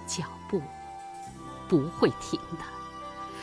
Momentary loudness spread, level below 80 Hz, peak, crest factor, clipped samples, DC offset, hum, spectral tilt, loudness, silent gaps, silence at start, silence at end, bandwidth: 15 LU; -56 dBFS; -8 dBFS; 24 dB; under 0.1%; under 0.1%; none; -5 dB/octave; -32 LUFS; none; 0 s; 0 s; 11 kHz